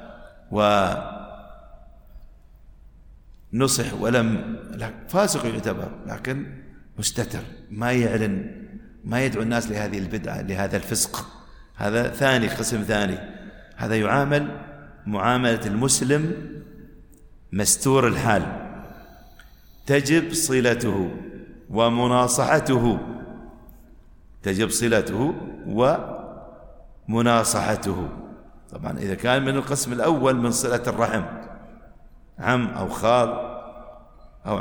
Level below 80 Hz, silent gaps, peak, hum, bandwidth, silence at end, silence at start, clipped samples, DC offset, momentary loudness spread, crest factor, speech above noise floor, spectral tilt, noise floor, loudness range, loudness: -46 dBFS; none; -4 dBFS; none; over 20 kHz; 0 s; 0 s; under 0.1%; under 0.1%; 19 LU; 20 dB; 25 dB; -4.5 dB/octave; -48 dBFS; 4 LU; -23 LUFS